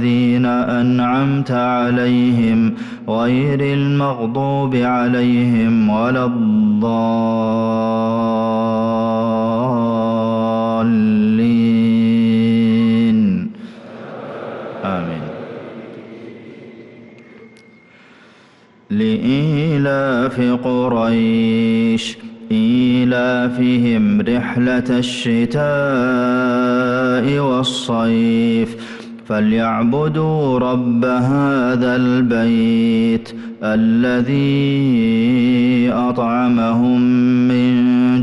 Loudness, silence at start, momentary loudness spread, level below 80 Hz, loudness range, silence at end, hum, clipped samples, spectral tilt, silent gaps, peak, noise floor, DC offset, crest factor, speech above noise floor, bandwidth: -16 LUFS; 0 s; 9 LU; -50 dBFS; 6 LU; 0 s; none; under 0.1%; -7.5 dB/octave; none; -8 dBFS; -48 dBFS; under 0.1%; 8 dB; 33 dB; 9.2 kHz